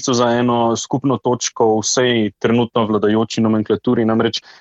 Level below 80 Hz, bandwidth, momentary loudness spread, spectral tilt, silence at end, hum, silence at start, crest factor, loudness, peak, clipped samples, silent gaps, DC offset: -56 dBFS; 8.2 kHz; 3 LU; -4.5 dB/octave; 0.2 s; none; 0 s; 14 dB; -16 LUFS; -2 dBFS; under 0.1%; none; under 0.1%